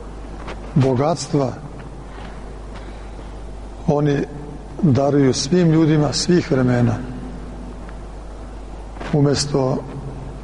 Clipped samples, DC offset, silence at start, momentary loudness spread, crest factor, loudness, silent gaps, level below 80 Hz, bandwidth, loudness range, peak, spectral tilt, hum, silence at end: under 0.1%; under 0.1%; 0 s; 20 LU; 14 dB; -18 LUFS; none; -36 dBFS; 10.5 kHz; 7 LU; -6 dBFS; -6 dB/octave; none; 0 s